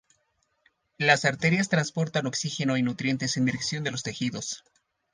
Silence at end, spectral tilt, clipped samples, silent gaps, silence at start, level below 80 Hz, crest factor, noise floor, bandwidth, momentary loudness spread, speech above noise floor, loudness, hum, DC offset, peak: 0.55 s; -4.5 dB/octave; under 0.1%; none; 1 s; -66 dBFS; 22 dB; -73 dBFS; 10 kHz; 9 LU; 46 dB; -26 LUFS; none; under 0.1%; -6 dBFS